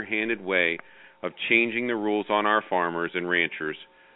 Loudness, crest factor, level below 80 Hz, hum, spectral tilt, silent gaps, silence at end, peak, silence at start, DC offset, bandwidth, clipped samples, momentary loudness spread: -25 LUFS; 20 dB; -72 dBFS; none; -8.5 dB/octave; none; 0.3 s; -6 dBFS; 0 s; under 0.1%; 4.1 kHz; under 0.1%; 13 LU